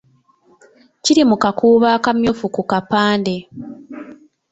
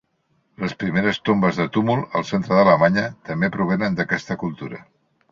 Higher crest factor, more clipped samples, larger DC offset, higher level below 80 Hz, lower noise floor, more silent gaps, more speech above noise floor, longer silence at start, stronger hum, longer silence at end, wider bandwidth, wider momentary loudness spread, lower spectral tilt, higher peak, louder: about the same, 16 dB vs 18 dB; neither; neither; about the same, -52 dBFS vs -54 dBFS; second, -55 dBFS vs -67 dBFS; neither; second, 40 dB vs 47 dB; first, 1.05 s vs 0.6 s; neither; second, 0.35 s vs 0.5 s; first, 8.2 kHz vs 7.4 kHz; first, 21 LU vs 13 LU; second, -4.5 dB/octave vs -7 dB/octave; about the same, -2 dBFS vs -2 dBFS; first, -16 LUFS vs -20 LUFS